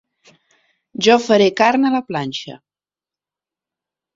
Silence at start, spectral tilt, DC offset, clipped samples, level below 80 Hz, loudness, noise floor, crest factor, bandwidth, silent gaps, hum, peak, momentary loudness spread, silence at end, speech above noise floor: 1 s; -4.5 dB/octave; under 0.1%; under 0.1%; -62 dBFS; -16 LUFS; under -90 dBFS; 18 dB; 7.8 kHz; none; none; -2 dBFS; 17 LU; 1.6 s; over 75 dB